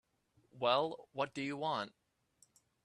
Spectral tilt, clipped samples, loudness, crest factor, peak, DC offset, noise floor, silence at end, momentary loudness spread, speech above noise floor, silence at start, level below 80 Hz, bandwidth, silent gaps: -5 dB/octave; under 0.1%; -37 LUFS; 22 dB; -18 dBFS; under 0.1%; -75 dBFS; 0.95 s; 8 LU; 38 dB; 0.55 s; -82 dBFS; 11.5 kHz; none